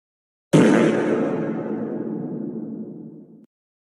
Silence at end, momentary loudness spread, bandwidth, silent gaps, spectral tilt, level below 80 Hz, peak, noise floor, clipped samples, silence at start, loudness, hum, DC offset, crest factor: 0.6 s; 19 LU; 12 kHz; none; -7 dB/octave; -68 dBFS; -2 dBFS; -41 dBFS; under 0.1%; 0.55 s; -21 LUFS; none; under 0.1%; 20 dB